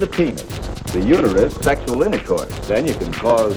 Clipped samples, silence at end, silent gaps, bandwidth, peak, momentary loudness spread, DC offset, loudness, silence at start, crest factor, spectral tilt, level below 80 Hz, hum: under 0.1%; 0 s; none; over 20 kHz; -2 dBFS; 9 LU; under 0.1%; -19 LUFS; 0 s; 16 dB; -6 dB/octave; -32 dBFS; none